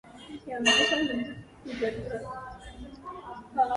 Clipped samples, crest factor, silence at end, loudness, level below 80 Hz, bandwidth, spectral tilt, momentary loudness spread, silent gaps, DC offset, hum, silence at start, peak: under 0.1%; 20 dB; 0 s; -27 LUFS; -54 dBFS; 11.5 kHz; -2.5 dB/octave; 22 LU; none; under 0.1%; none; 0.05 s; -10 dBFS